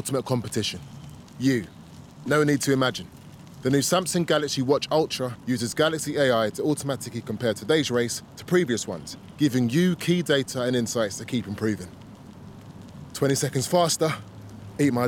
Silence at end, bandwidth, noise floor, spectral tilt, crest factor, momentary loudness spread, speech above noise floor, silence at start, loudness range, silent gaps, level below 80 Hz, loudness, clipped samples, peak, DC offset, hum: 0 s; 17.5 kHz; -44 dBFS; -4.5 dB/octave; 16 dB; 21 LU; 19 dB; 0 s; 3 LU; none; -60 dBFS; -25 LUFS; under 0.1%; -8 dBFS; under 0.1%; none